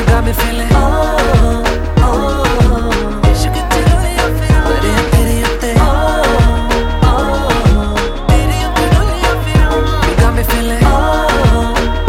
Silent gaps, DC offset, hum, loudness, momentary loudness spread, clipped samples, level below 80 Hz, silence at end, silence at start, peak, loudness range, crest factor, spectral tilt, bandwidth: none; under 0.1%; none; -12 LUFS; 3 LU; under 0.1%; -14 dBFS; 0 s; 0 s; 0 dBFS; 1 LU; 10 dB; -5.5 dB/octave; 16.5 kHz